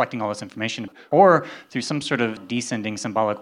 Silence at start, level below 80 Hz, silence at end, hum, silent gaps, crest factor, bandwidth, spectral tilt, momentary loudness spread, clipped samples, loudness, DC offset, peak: 0 s; -74 dBFS; 0 s; none; none; 20 dB; 12 kHz; -5 dB/octave; 13 LU; under 0.1%; -22 LUFS; under 0.1%; -2 dBFS